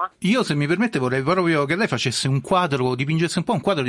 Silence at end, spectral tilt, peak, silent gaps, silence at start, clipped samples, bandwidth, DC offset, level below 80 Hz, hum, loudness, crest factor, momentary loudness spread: 0 s; -5.5 dB/octave; -6 dBFS; none; 0 s; under 0.1%; 12 kHz; under 0.1%; -56 dBFS; none; -21 LUFS; 14 dB; 2 LU